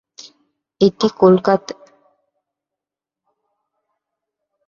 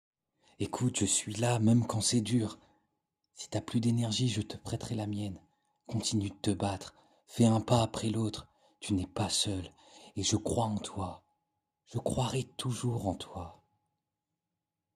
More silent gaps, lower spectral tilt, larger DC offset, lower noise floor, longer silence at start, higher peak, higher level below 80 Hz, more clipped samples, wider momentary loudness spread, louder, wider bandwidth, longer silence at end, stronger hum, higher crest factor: neither; first, -7 dB/octave vs -5 dB/octave; neither; about the same, -87 dBFS vs -89 dBFS; first, 0.8 s vs 0.6 s; first, -2 dBFS vs -10 dBFS; about the same, -62 dBFS vs -62 dBFS; neither; first, 19 LU vs 15 LU; first, -15 LUFS vs -32 LUFS; second, 7.2 kHz vs 14.5 kHz; first, 2.95 s vs 1.4 s; neither; about the same, 20 dB vs 22 dB